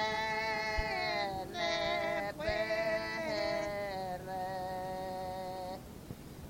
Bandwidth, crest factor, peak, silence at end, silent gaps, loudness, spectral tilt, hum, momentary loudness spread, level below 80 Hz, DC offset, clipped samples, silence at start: 16.5 kHz; 18 dB; -20 dBFS; 0 s; none; -36 LUFS; -4 dB/octave; none; 8 LU; -52 dBFS; under 0.1%; under 0.1%; 0 s